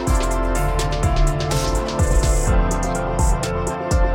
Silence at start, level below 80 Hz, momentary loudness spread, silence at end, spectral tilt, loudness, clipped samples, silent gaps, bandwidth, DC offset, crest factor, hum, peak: 0 s; -20 dBFS; 3 LU; 0 s; -5 dB/octave; -21 LUFS; under 0.1%; none; 16.5 kHz; under 0.1%; 12 dB; none; -6 dBFS